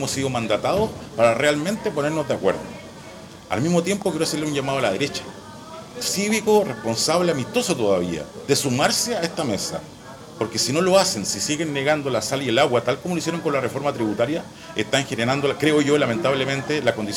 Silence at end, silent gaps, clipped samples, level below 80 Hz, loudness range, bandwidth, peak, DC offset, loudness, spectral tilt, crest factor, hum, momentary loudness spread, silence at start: 0 s; none; under 0.1%; -54 dBFS; 3 LU; 17 kHz; -6 dBFS; under 0.1%; -22 LUFS; -4 dB/octave; 16 dB; none; 12 LU; 0 s